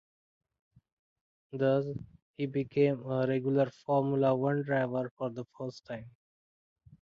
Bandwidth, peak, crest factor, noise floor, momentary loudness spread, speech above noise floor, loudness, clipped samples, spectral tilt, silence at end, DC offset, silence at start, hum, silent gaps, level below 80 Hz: 7 kHz; -14 dBFS; 18 dB; under -90 dBFS; 16 LU; over 59 dB; -31 LUFS; under 0.1%; -9 dB/octave; 0.95 s; under 0.1%; 1.55 s; none; 2.22-2.34 s, 5.11-5.17 s; -70 dBFS